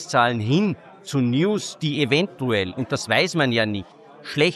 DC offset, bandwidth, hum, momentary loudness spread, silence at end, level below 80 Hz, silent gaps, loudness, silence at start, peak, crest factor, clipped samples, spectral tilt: under 0.1%; 12.5 kHz; none; 8 LU; 0 s; -54 dBFS; none; -22 LUFS; 0 s; -4 dBFS; 18 dB; under 0.1%; -5 dB/octave